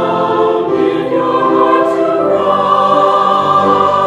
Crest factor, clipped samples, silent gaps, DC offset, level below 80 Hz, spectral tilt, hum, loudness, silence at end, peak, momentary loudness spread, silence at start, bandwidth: 10 dB; under 0.1%; none; under 0.1%; -54 dBFS; -6.5 dB/octave; none; -11 LUFS; 0 s; 0 dBFS; 4 LU; 0 s; 10.5 kHz